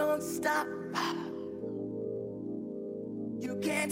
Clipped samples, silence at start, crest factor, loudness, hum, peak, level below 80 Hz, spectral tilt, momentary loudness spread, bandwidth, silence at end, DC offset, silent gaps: under 0.1%; 0 s; 16 dB; -35 LUFS; none; -18 dBFS; -72 dBFS; -4.5 dB/octave; 8 LU; 16 kHz; 0 s; under 0.1%; none